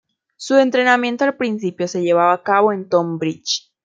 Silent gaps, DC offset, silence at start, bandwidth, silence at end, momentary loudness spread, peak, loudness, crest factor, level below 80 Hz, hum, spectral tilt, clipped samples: none; under 0.1%; 0.4 s; 7.8 kHz; 0.25 s; 8 LU; -2 dBFS; -17 LUFS; 16 dB; -70 dBFS; none; -4.5 dB/octave; under 0.1%